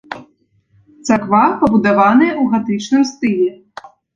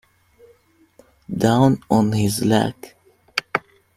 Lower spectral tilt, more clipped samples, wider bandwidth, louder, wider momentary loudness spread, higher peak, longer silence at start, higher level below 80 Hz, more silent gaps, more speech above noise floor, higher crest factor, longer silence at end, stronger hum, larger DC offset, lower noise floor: about the same, -6 dB/octave vs -6 dB/octave; neither; second, 7.6 kHz vs 16 kHz; first, -14 LUFS vs -20 LUFS; about the same, 9 LU vs 11 LU; about the same, -2 dBFS vs -2 dBFS; second, 0.1 s vs 1.3 s; about the same, -52 dBFS vs -52 dBFS; neither; first, 44 dB vs 38 dB; second, 14 dB vs 20 dB; about the same, 0.3 s vs 0.4 s; neither; neither; about the same, -57 dBFS vs -56 dBFS